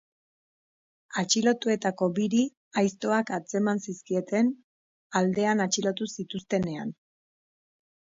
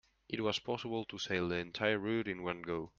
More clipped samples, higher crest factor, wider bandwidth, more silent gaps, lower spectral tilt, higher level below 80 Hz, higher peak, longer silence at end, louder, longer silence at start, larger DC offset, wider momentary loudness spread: neither; about the same, 18 dB vs 22 dB; about the same, 7.8 kHz vs 7.6 kHz; first, 2.57-2.71 s, 4.64-5.10 s vs none; about the same, -4.5 dB/octave vs -5 dB/octave; about the same, -68 dBFS vs -68 dBFS; first, -10 dBFS vs -16 dBFS; first, 1.25 s vs 0.1 s; first, -27 LUFS vs -37 LUFS; first, 1.1 s vs 0.3 s; neither; first, 9 LU vs 6 LU